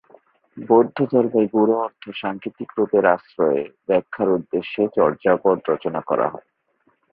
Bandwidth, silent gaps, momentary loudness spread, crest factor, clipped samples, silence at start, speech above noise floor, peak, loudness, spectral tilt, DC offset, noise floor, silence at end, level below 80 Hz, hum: 4.8 kHz; none; 11 LU; 18 dB; under 0.1%; 0.55 s; 45 dB; -2 dBFS; -20 LUFS; -11 dB/octave; under 0.1%; -65 dBFS; 0.75 s; -62 dBFS; none